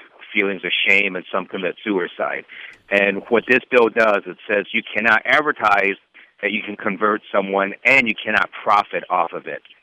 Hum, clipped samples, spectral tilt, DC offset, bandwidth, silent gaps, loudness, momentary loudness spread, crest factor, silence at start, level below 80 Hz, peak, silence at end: none; under 0.1%; -5 dB/octave; under 0.1%; 13 kHz; none; -18 LUFS; 11 LU; 18 dB; 0.2 s; -64 dBFS; -2 dBFS; 0.25 s